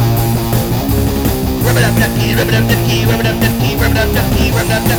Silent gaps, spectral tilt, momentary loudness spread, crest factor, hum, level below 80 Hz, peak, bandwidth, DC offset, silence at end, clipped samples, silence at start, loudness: none; -5.5 dB/octave; 3 LU; 12 dB; none; -22 dBFS; 0 dBFS; 19 kHz; under 0.1%; 0 s; under 0.1%; 0 s; -13 LUFS